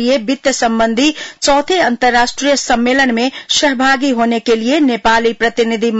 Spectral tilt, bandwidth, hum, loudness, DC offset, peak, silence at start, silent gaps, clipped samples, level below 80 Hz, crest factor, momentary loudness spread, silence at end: -2.5 dB/octave; 8.2 kHz; none; -13 LUFS; under 0.1%; -2 dBFS; 0 s; none; under 0.1%; -42 dBFS; 12 dB; 3 LU; 0 s